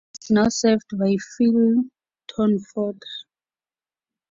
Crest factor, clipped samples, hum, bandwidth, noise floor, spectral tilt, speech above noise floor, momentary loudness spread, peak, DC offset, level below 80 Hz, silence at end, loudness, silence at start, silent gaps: 16 dB; under 0.1%; none; 7.6 kHz; under -90 dBFS; -5.5 dB/octave; over 70 dB; 16 LU; -6 dBFS; under 0.1%; -58 dBFS; 1.1 s; -21 LUFS; 0.15 s; none